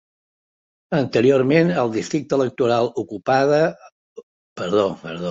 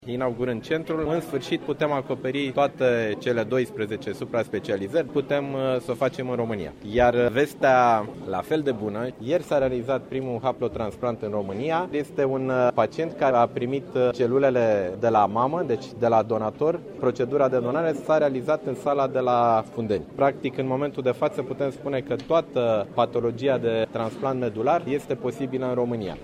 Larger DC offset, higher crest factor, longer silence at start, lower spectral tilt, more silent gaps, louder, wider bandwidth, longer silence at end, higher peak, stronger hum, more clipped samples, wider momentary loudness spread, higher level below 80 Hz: neither; about the same, 18 dB vs 18 dB; first, 0.9 s vs 0 s; about the same, -6.5 dB/octave vs -7 dB/octave; first, 3.92-4.16 s, 4.23-4.56 s vs none; first, -19 LUFS vs -25 LUFS; second, 7.8 kHz vs 15 kHz; about the same, 0 s vs 0 s; about the same, -4 dBFS vs -6 dBFS; neither; neither; about the same, 8 LU vs 7 LU; second, -60 dBFS vs -54 dBFS